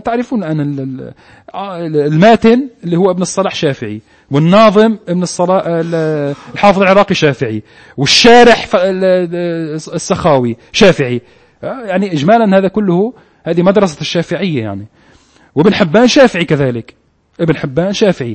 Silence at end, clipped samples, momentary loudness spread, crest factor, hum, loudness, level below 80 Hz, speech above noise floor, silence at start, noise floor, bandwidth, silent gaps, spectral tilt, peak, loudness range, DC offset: 0 s; 0.4%; 15 LU; 12 dB; none; -11 LUFS; -44 dBFS; 35 dB; 0.05 s; -46 dBFS; 11 kHz; none; -5.5 dB/octave; 0 dBFS; 4 LU; under 0.1%